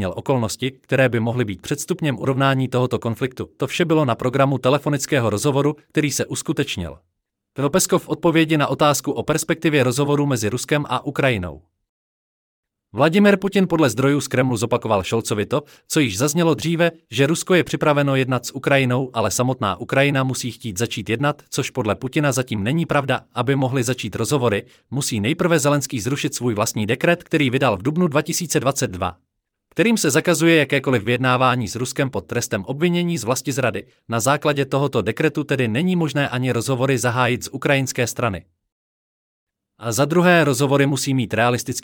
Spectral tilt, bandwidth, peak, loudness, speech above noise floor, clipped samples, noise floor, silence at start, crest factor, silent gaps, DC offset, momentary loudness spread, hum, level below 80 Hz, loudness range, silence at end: -5 dB/octave; 18.5 kHz; -2 dBFS; -20 LUFS; 45 dB; under 0.1%; -64 dBFS; 0 s; 16 dB; 11.89-12.63 s, 38.72-39.47 s; under 0.1%; 7 LU; none; -56 dBFS; 3 LU; 0.05 s